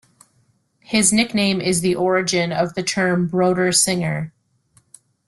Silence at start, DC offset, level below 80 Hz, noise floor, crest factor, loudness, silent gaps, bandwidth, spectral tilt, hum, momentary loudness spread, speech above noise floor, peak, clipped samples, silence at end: 0.9 s; under 0.1%; -56 dBFS; -62 dBFS; 18 dB; -18 LUFS; none; 12.5 kHz; -3.5 dB/octave; none; 6 LU; 44 dB; -2 dBFS; under 0.1%; 1 s